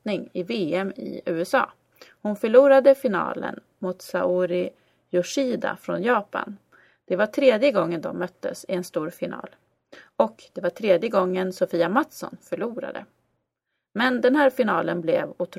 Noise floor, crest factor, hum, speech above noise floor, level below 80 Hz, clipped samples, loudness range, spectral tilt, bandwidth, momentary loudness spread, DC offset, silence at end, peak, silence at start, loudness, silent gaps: -81 dBFS; 20 dB; none; 58 dB; -70 dBFS; under 0.1%; 5 LU; -5.5 dB/octave; 15 kHz; 14 LU; under 0.1%; 0 s; -4 dBFS; 0.05 s; -23 LUFS; none